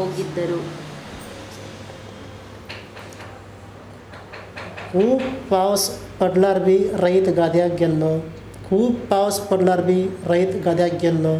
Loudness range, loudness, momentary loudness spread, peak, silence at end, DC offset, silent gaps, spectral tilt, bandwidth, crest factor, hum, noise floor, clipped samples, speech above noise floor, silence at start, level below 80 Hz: 18 LU; -19 LUFS; 21 LU; -4 dBFS; 0 s; under 0.1%; none; -6 dB/octave; 14.5 kHz; 18 dB; none; -40 dBFS; under 0.1%; 21 dB; 0 s; -50 dBFS